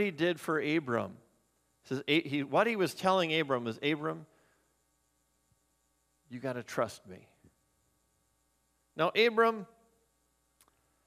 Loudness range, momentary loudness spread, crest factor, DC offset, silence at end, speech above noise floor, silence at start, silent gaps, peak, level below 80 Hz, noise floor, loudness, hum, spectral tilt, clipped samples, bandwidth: 11 LU; 16 LU; 22 dB; under 0.1%; 1.4 s; 44 dB; 0 s; none; -12 dBFS; -78 dBFS; -76 dBFS; -31 LUFS; none; -5 dB/octave; under 0.1%; 15.5 kHz